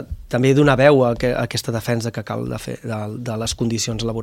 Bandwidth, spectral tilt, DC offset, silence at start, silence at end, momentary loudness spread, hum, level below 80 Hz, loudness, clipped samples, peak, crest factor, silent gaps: 16.5 kHz; -5.5 dB/octave; under 0.1%; 0 s; 0 s; 14 LU; none; -40 dBFS; -19 LUFS; under 0.1%; 0 dBFS; 18 dB; none